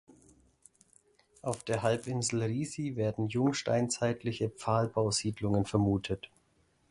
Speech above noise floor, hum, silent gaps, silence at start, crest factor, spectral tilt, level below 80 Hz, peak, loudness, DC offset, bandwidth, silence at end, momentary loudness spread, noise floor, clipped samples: 39 dB; none; none; 1.45 s; 20 dB; -5.5 dB/octave; -58 dBFS; -14 dBFS; -32 LUFS; under 0.1%; 11.5 kHz; 0.65 s; 8 LU; -70 dBFS; under 0.1%